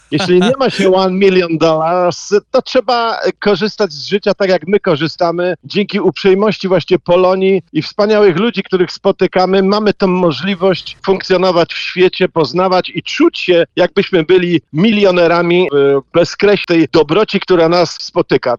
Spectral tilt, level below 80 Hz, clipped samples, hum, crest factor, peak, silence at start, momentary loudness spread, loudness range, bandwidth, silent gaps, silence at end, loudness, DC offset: -6 dB/octave; -48 dBFS; under 0.1%; none; 12 dB; 0 dBFS; 0.1 s; 5 LU; 3 LU; 9.2 kHz; none; 0 s; -12 LUFS; under 0.1%